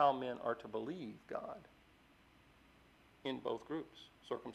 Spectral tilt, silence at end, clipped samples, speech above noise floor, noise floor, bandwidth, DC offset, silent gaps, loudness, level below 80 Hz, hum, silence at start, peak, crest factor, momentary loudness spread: -6.5 dB/octave; 0 s; under 0.1%; 26 dB; -67 dBFS; 13 kHz; under 0.1%; none; -43 LUFS; -76 dBFS; none; 0 s; -20 dBFS; 24 dB; 15 LU